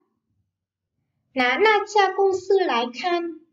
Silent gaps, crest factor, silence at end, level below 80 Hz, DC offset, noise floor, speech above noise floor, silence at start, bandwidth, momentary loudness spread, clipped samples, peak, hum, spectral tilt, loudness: none; 16 dB; 0.15 s; -70 dBFS; under 0.1%; -83 dBFS; 62 dB; 1.35 s; 7.6 kHz; 7 LU; under 0.1%; -6 dBFS; none; -2.5 dB/octave; -21 LUFS